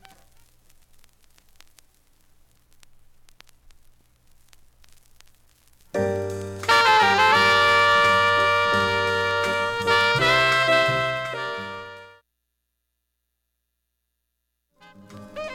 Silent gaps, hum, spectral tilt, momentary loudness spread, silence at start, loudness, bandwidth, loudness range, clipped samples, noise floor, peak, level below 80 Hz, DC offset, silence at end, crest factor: none; 60 Hz at -65 dBFS; -3 dB/octave; 16 LU; 5.95 s; -19 LUFS; 16.5 kHz; 16 LU; under 0.1%; -78 dBFS; -6 dBFS; -56 dBFS; under 0.1%; 0 s; 18 dB